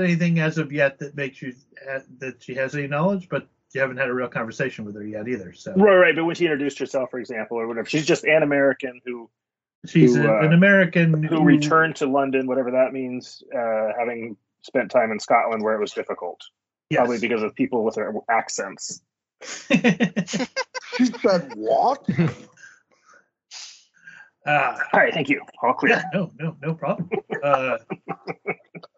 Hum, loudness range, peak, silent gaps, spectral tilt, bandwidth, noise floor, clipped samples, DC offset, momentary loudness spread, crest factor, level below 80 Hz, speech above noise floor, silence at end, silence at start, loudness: none; 8 LU; -2 dBFS; 9.75-9.82 s; -5 dB/octave; 8 kHz; -57 dBFS; under 0.1%; under 0.1%; 17 LU; 20 dB; -66 dBFS; 35 dB; 0.2 s; 0 s; -21 LUFS